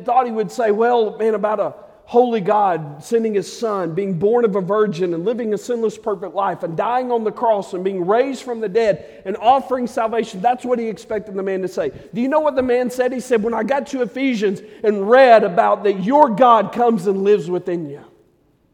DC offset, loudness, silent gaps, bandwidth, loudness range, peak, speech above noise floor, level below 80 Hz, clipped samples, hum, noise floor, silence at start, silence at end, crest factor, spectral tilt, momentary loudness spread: under 0.1%; -18 LUFS; none; 14.5 kHz; 6 LU; 0 dBFS; 41 dB; -60 dBFS; under 0.1%; none; -58 dBFS; 0 s; 0.7 s; 18 dB; -6 dB/octave; 10 LU